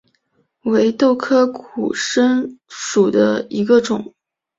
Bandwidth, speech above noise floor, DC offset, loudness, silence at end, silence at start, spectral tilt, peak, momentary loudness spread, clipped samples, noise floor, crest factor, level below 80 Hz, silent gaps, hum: 7.8 kHz; 48 dB; under 0.1%; -17 LUFS; 0.55 s; 0.65 s; -4.5 dB/octave; -2 dBFS; 11 LU; under 0.1%; -64 dBFS; 14 dB; -62 dBFS; none; none